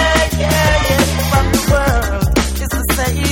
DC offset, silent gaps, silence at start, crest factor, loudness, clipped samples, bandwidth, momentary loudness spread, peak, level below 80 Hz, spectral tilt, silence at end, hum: under 0.1%; none; 0 s; 12 dB; -14 LUFS; under 0.1%; 17.5 kHz; 4 LU; 0 dBFS; -20 dBFS; -4.5 dB/octave; 0 s; none